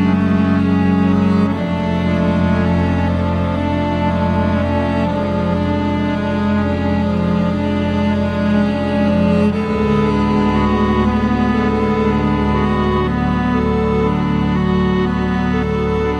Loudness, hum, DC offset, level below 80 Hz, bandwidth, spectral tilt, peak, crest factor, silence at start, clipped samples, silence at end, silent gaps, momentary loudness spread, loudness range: -16 LUFS; none; under 0.1%; -28 dBFS; 8.6 kHz; -8.5 dB/octave; -4 dBFS; 12 dB; 0 s; under 0.1%; 0 s; none; 3 LU; 2 LU